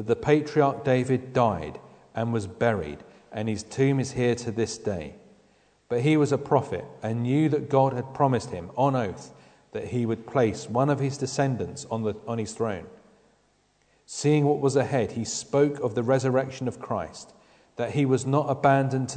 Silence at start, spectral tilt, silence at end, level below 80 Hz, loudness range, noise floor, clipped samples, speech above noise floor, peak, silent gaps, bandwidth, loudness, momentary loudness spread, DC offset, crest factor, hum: 0 s; -6.5 dB/octave; 0 s; -58 dBFS; 3 LU; -66 dBFS; under 0.1%; 41 dB; -6 dBFS; none; 9.4 kHz; -26 LUFS; 12 LU; under 0.1%; 20 dB; none